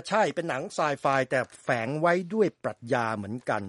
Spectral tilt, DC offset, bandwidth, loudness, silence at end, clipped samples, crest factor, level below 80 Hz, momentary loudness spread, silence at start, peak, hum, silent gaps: -5.5 dB/octave; under 0.1%; 11.5 kHz; -28 LUFS; 0 s; under 0.1%; 18 dB; -72 dBFS; 6 LU; 0.05 s; -10 dBFS; none; none